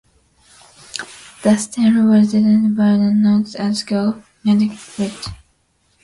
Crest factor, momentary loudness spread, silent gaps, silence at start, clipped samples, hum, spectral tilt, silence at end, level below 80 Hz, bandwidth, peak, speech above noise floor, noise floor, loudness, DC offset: 14 dB; 16 LU; none; 0.95 s; under 0.1%; none; -6 dB/octave; 0.7 s; -52 dBFS; 11.5 kHz; -2 dBFS; 46 dB; -61 dBFS; -16 LUFS; under 0.1%